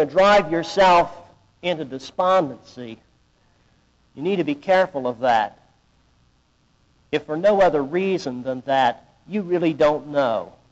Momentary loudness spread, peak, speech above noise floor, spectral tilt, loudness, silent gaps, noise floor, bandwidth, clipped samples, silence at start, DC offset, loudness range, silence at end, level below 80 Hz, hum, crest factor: 14 LU; -8 dBFS; 42 dB; -3.5 dB/octave; -21 LUFS; none; -62 dBFS; 8 kHz; under 0.1%; 0 s; under 0.1%; 4 LU; 0.25 s; -54 dBFS; none; 14 dB